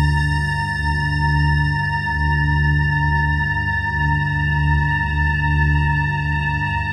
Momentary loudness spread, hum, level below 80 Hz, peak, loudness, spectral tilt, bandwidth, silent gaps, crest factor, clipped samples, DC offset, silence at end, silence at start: 3 LU; 50 Hz at -40 dBFS; -24 dBFS; -6 dBFS; -19 LUFS; -6.5 dB/octave; 9.4 kHz; none; 12 dB; under 0.1%; under 0.1%; 0 s; 0 s